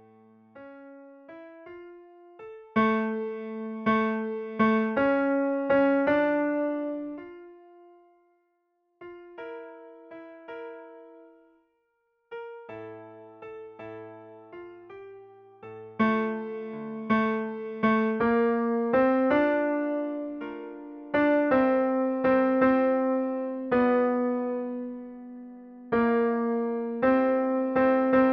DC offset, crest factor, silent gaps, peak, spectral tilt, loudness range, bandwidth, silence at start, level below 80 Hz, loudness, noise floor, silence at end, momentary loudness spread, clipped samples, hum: under 0.1%; 18 dB; none; -10 dBFS; -5 dB/octave; 20 LU; 5.4 kHz; 0.55 s; -64 dBFS; -26 LUFS; -74 dBFS; 0 s; 23 LU; under 0.1%; none